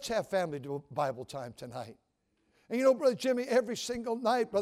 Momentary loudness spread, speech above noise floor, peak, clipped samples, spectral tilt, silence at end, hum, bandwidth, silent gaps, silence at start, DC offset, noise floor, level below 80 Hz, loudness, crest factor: 15 LU; 44 dB; -14 dBFS; under 0.1%; -4.5 dB/octave; 0 s; none; 15 kHz; none; 0 s; under 0.1%; -76 dBFS; -68 dBFS; -31 LUFS; 18 dB